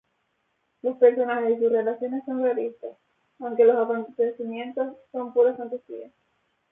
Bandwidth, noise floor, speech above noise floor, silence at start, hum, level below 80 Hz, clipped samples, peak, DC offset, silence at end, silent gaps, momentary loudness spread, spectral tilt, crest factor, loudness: 3.7 kHz; -73 dBFS; 49 dB; 0.85 s; none; -80 dBFS; under 0.1%; -6 dBFS; under 0.1%; 0.65 s; none; 16 LU; -9 dB/octave; 20 dB; -24 LUFS